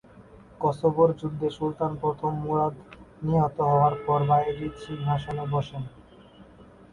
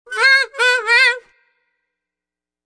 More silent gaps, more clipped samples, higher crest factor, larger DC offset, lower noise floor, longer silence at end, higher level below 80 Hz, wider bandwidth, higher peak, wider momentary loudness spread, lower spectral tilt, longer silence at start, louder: neither; neither; about the same, 18 dB vs 16 dB; neither; second, -51 dBFS vs -88 dBFS; second, 0.3 s vs 1.5 s; first, -54 dBFS vs -70 dBFS; about the same, 10.5 kHz vs 11 kHz; second, -8 dBFS vs -2 dBFS; first, 12 LU vs 4 LU; first, -9 dB/octave vs 4.5 dB/octave; about the same, 0.2 s vs 0.1 s; second, -26 LUFS vs -13 LUFS